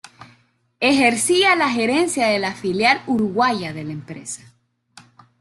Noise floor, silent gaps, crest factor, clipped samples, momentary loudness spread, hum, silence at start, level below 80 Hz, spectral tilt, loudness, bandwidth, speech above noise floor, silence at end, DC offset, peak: -59 dBFS; none; 18 dB; under 0.1%; 16 LU; none; 0.2 s; -60 dBFS; -3 dB/octave; -18 LUFS; 12.5 kHz; 40 dB; 1.05 s; under 0.1%; -2 dBFS